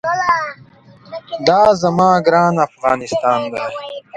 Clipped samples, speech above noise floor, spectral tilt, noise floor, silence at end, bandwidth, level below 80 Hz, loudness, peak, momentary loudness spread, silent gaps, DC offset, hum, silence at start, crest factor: under 0.1%; 29 dB; -5.5 dB/octave; -44 dBFS; 0 s; 9.2 kHz; -52 dBFS; -15 LUFS; 0 dBFS; 16 LU; none; under 0.1%; none; 0.05 s; 16 dB